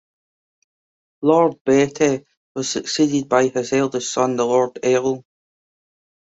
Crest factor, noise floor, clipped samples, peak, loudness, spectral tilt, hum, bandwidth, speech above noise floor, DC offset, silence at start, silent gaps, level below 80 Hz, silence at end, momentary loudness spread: 18 dB; under -90 dBFS; under 0.1%; -4 dBFS; -19 LUFS; -4.5 dB/octave; none; 8.2 kHz; over 72 dB; under 0.1%; 1.2 s; 1.61-1.65 s, 2.37-2.55 s; -60 dBFS; 1.05 s; 9 LU